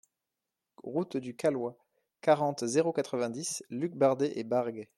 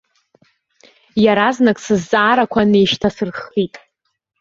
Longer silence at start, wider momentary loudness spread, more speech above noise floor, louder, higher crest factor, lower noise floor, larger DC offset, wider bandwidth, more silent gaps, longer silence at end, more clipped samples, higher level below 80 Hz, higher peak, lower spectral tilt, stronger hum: second, 0.85 s vs 1.15 s; about the same, 9 LU vs 9 LU; about the same, 58 dB vs 57 dB; second, -31 LUFS vs -16 LUFS; about the same, 20 dB vs 16 dB; first, -88 dBFS vs -72 dBFS; neither; first, 14 kHz vs 7.8 kHz; neither; second, 0.15 s vs 0.65 s; neither; second, -78 dBFS vs -50 dBFS; second, -12 dBFS vs 0 dBFS; about the same, -5 dB/octave vs -5.5 dB/octave; neither